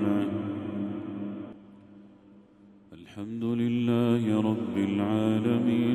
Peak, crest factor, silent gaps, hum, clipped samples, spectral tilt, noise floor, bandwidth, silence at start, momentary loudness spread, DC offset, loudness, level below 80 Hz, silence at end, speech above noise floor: -14 dBFS; 16 dB; none; none; under 0.1%; -8 dB/octave; -55 dBFS; 11.5 kHz; 0 s; 13 LU; under 0.1%; -28 LUFS; -68 dBFS; 0 s; 30 dB